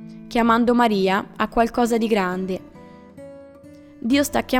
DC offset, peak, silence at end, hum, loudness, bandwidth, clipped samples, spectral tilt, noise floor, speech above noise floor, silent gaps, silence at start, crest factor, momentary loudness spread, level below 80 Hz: under 0.1%; -4 dBFS; 0 s; none; -20 LUFS; 19.5 kHz; under 0.1%; -5 dB/octave; -44 dBFS; 25 dB; none; 0 s; 16 dB; 14 LU; -46 dBFS